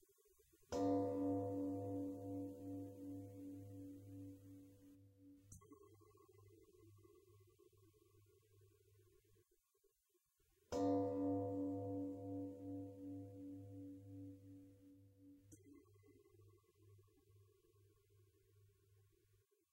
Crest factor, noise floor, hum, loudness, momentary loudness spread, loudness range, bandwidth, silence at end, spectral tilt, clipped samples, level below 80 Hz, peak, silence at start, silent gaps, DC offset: 20 dB; -84 dBFS; none; -47 LUFS; 26 LU; 22 LU; 16 kHz; 1.05 s; -8 dB/octave; under 0.1%; -78 dBFS; -30 dBFS; 0.6 s; none; under 0.1%